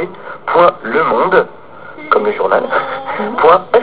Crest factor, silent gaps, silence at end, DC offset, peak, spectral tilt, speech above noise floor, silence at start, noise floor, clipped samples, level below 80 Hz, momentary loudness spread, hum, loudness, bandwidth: 14 dB; none; 0 s; 1%; 0 dBFS; -8.5 dB/octave; 21 dB; 0 s; -33 dBFS; 0.4%; -50 dBFS; 14 LU; none; -13 LUFS; 4 kHz